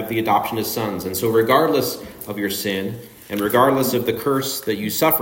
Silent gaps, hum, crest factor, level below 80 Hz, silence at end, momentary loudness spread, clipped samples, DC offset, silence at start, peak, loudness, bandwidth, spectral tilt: none; none; 20 dB; -56 dBFS; 0 s; 11 LU; under 0.1%; under 0.1%; 0 s; 0 dBFS; -20 LUFS; 16.5 kHz; -4.5 dB/octave